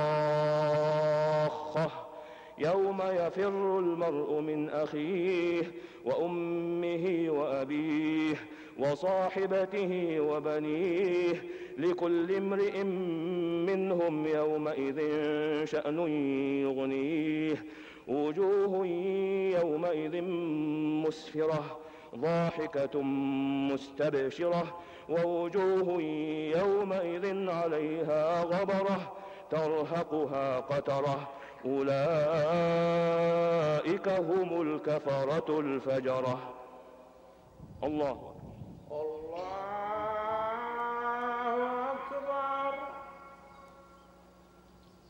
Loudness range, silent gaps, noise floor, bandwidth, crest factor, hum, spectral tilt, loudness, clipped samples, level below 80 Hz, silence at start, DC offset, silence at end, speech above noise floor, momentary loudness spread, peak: 6 LU; none; -58 dBFS; 9.2 kHz; 10 dB; none; -7.5 dB/octave; -32 LUFS; under 0.1%; -68 dBFS; 0 s; under 0.1%; 1.25 s; 28 dB; 10 LU; -20 dBFS